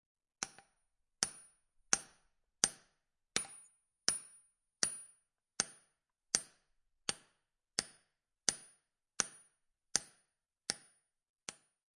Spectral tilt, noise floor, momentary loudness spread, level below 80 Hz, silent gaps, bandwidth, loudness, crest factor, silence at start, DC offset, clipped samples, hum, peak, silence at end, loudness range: 0.5 dB/octave; -82 dBFS; 21 LU; -76 dBFS; 11.29-11.34 s; 11.5 kHz; -38 LUFS; 36 dB; 0.4 s; under 0.1%; under 0.1%; none; -8 dBFS; 0.5 s; 3 LU